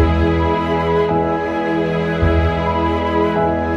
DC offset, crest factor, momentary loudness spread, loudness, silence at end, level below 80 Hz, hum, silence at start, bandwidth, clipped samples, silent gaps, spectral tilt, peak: under 0.1%; 14 dB; 3 LU; -17 LUFS; 0 s; -28 dBFS; none; 0 s; 7 kHz; under 0.1%; none; -8 dB/octave; -2 dBFS